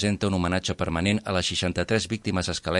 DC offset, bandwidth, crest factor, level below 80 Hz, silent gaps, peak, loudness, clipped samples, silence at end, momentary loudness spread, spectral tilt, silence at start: under 0.1%; 11.5 kHz; 18 dB; -48 dBFS; none; -8 dBFS; -26 LUFS; under 0.1%; 0 s; 3 LU; -4.5 dB/octave; 0 s